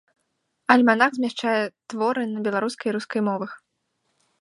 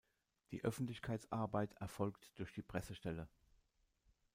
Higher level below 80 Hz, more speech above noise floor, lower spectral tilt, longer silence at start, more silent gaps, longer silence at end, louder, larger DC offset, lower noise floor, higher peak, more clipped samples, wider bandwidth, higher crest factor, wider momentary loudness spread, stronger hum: second, -76 dBFS vs -68 dBFS; first, 52 dB vs 35 dB; second, -5 dB/octave vs -6.5 dB/octave; first, 0.7 s vs 0.5 s; neither; second, 0.85 s vs 1.1 s; first, -23 LUFS vs -46 LUFS; neither; second, -75 dBFS vs -79 dBFS; first, -2 dBFS vs -26 dBFS; neither; second, 11.5 kHz vs 16 kHz; about the same, 22 dB vs 20 dB; first, 13 LU vs 9 LU; neither